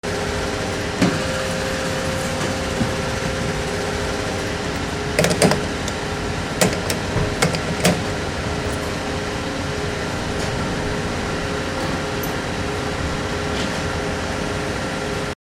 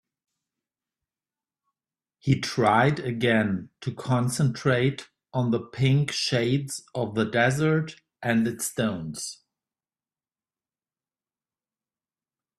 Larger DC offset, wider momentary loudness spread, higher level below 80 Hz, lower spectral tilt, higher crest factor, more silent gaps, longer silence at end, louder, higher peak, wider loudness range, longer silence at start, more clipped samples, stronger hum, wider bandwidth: neither; second, 5 LU vs 12 LU; first, -34 dBFS vs -62 dBFS; about the same, -4.5 dB/octave vs -5.5 dB/octave; about the same, 22 dB vs 20 dB; neither; second, 0.1 s vs 3.25 s; first, -22 LUFS vs -25 LUFS; first, 0 dBFS vs -8 dBFS; second, 3 LU vs 7 LU; second, 0.05 s vs 2.25 s; neither; neither; first, 16 kHz vs 13.5 kHz